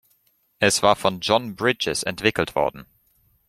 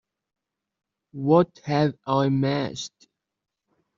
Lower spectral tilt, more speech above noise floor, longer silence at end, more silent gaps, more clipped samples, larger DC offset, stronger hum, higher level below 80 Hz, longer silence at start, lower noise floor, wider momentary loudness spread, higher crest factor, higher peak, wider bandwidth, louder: second, -3 dB/octave vs -6.5 dB/octave; second, 43 dB vs 62 dB; second, 0.65 s vs 1.1 s; neither; neither; neither; neither; first, -54 dBFS vs -66 dBFS; second, 0.6 s vs 1.15 s; second, -65 dBFS vs -85 dBFS; second, 6 LU vs 15 LU; about the same, 22 dB vs 20 dB; first, -2 dBFS vs -6 dBFS; first, 16 kHz vs 7.6 kHz; about the same, -21 LUFS vs -23 LUFS